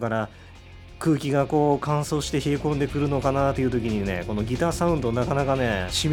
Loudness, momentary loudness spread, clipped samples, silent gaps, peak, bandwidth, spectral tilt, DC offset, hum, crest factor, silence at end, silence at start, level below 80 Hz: -24 LUFS; 5 LU; under 0.1%; none; -8 dBFS; 17 kHz; -6 dB/octave; under 0.1%; none; 16 dB; 0 s; 0 s; -40 dBFS